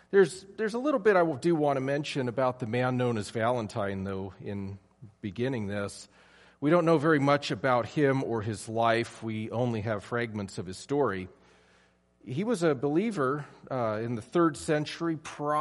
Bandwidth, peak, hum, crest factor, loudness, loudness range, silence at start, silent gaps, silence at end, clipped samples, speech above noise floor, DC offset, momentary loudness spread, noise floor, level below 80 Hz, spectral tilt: 11.5 kHz; -10 dBFS; none; 20 dB; -29 LUFS; 6 LU; 0.1 s; none; 0 s; under 0.1%; 36 dB; under 0.1%; 13 LU; -65 dBFS; -66 dBFS; -6.5 dB/octave